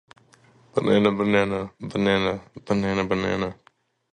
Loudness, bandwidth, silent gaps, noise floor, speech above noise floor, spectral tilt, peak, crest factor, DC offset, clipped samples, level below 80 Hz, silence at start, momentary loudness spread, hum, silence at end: -23 LUFS; 9.4 kHz; none; -56 dBFS; 33 dB; -6.5 dB/octave; -4 dBFS; 20 dB; under 0.1%; under 0.1%; -52 dBFS; 0.75 s; 10 LU; none; 0.6 s